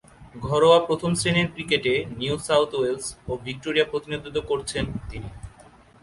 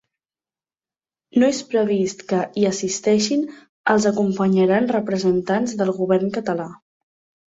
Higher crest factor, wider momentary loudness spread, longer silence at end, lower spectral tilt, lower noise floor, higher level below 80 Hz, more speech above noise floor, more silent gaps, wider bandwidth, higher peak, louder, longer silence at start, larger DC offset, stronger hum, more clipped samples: about the same, 20 dB vs 18 dB; first, 15 LU vs 7 LU; second, 0.4 s vs 0.7 s; about the same, -4.5 dB/octave vs -5.5 dB/octave; second, -51 dBFS vs under -90 dBFS; first, -46 dBFS vs -62 dBFS; second, 27 dB vs over 71 dB; second, none vs 3.69-3.84 s; first, 11.5 kHz vs 8 kHz; about the same, -4 dBFS vs -4 dBFS; second, -23 LUFS vs -20 LUFS; second, 0.2 s vs 1.35 s; neither; neither; neither